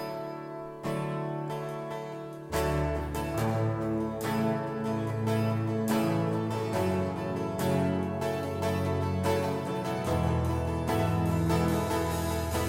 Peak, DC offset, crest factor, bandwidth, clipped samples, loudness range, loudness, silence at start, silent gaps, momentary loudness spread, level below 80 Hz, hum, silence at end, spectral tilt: -14 dBFS; under 0.1%; 16 dB; 16.5 kHz; under 0.1%; 3 LU; -30 LUFS; 0 s; none; 8 LU; -44 dBFS; none; 0 s; -6.5 dB/octave